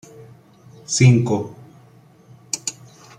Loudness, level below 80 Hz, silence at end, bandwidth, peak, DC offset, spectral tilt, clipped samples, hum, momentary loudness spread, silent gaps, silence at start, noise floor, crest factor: -19 LUFS; -56 dBFS; 0.5 s; 10 kHz; -2 dBFS; under 0.1%; -5 dB/octave; under 0.1%; none; 19 LU; none; 0.9 s; -49 dBFS; 20 dB